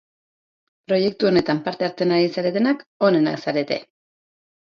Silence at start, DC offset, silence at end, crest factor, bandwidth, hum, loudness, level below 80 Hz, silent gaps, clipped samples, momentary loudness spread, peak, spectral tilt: 0.9 s; under 0.1%; 0.9 s; 18 dB; 7 kHz; none; -21 LUFS; -62 dBFS; 2.86-3.00 s; under 0.1%; 6 LU; -4 dBFS; -7 dB/octave